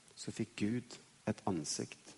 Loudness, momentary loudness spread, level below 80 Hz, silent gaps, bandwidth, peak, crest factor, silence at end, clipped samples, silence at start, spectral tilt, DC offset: -40 LUFS; 7 LU; -72 dBFS; none; 11.5 kHz; -20 dBFS; 20 dB; 0 s; under 0.1%; 0.15 s; -4.5 dB/octave; under 0.1%